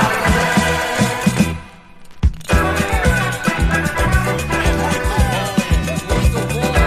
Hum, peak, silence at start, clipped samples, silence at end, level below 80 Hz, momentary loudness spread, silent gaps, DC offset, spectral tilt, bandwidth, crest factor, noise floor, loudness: none; -2 dBFS; 0 s; under 0.1%; 0 s; -22 dBFS; 4 LU; none; under 0.1%; -5 dB/octave; 15.5 kHz; 16 dB; -37 dBFS; -17 LUFS